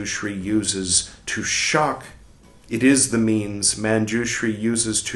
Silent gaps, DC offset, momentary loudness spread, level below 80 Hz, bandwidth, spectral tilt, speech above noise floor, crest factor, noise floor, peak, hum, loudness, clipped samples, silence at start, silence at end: none; under 0.1%; 9 LU; -50 dBFS; 12.5 kHz; -3 dB/octave; 27 dB; 18 dB; -48 dBFS; -4 dBFS; none; -20 LUFS; under 0.1%; 0 s; 0 s